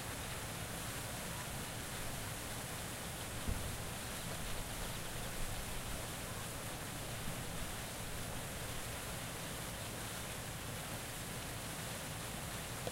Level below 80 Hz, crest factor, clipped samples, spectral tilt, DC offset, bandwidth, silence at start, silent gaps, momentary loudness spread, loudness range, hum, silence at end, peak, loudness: -52 dBFS; 20 dB; under 0.1%; -3 dB/octave; under 0.1%; 16 kHz; 0 s; none; 1 LU; 1 LU; none; 0 s; -24 dBFS; -43 LUFS